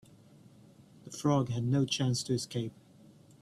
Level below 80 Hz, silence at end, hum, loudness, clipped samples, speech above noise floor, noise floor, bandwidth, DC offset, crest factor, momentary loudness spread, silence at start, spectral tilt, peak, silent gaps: -66 dBFS; 0.7 s; none; -32 LUFS; under 0.1%; 27 dB; -58 dBFS; 13 kHz; under 0.1%; 18 dB; 10 LU; 1.05 s; -5.5 dB/octave; -16 dBFS; none